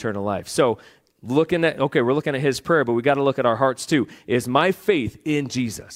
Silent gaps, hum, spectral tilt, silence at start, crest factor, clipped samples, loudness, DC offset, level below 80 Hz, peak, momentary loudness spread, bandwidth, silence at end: none; none; -5.5 dB/octave; 0 s; 18 dB; under 0.1%; -21 LUFS; under 0.1%; -56 dBFS; -2 dBFS; 6 LU; 16.5 kHz; 0 s